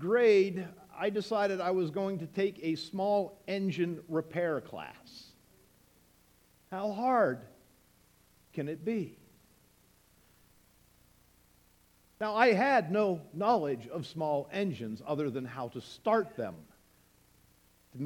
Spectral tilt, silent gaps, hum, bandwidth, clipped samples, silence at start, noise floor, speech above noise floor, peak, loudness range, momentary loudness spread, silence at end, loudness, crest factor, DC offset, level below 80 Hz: -6.5 dB/octave; none; none; 18 kHz; under 0.1%; 0 s; -66 dBFS; 34 dB; -10 dBFS; 12 LU; 17 LU; 0 s; -32 LUFS; 24 dB; under 0.1%; -72 dBFS